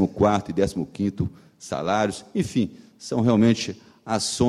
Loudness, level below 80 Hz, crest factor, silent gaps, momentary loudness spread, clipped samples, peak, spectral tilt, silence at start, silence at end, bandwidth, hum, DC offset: -24 LUFS; -50 dBFS; 18 dB; none; 13 LU; under 0.1%; -6 dBFS; -5.5 dB/octave; 0 s; 0 s; 13 kHz; none; under 0.1%